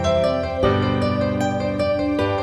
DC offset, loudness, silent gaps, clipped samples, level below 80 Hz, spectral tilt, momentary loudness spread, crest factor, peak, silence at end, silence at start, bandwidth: under 0.1%; -21 LUFS; none; under 0.1%; -38 dBFS; -6.5 dB/octave; 3 LU; 14 dB; -6 dBFS; 0 s; 0 s; 11 kHz